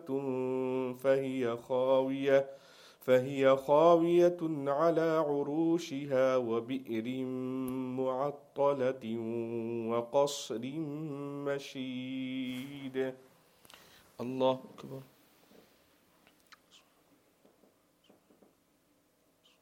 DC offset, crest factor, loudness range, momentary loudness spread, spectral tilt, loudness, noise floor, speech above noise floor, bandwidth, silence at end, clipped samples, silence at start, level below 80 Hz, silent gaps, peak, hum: under 0.1%; 20 dB; 12 LU; 13 LU; -6 dB/octave; -32 LUFS; -71 dBFS; 40 dB; 16 kHz; 4.6 s; under 0.1%; 0 s; -80 dBFS; none; -12 dBFS; none